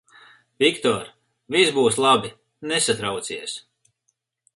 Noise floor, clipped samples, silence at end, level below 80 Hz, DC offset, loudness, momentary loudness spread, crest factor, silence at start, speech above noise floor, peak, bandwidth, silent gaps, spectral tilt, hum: -73 dBFS; under 0.1%; 0.95 s; -62 dBFS; under 0.1%; -21 LUFS; 18 LU; 20 dB; 0.6 s; 52 dB; -2 dBFS; 11.5 kHz; none; -2.5 dB/octave; none